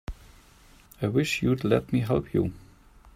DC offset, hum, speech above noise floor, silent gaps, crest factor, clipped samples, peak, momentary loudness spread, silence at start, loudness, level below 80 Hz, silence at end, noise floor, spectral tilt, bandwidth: under 0.1%; none; 30 dB; none; 20 dB; under 0.1%; -8 dBFS; 8 LU; 0.1 s; -26 LUFS; -48 dBFS; 0.05 s; -55 dBFS; -6.5 dB/octave; 16 kHz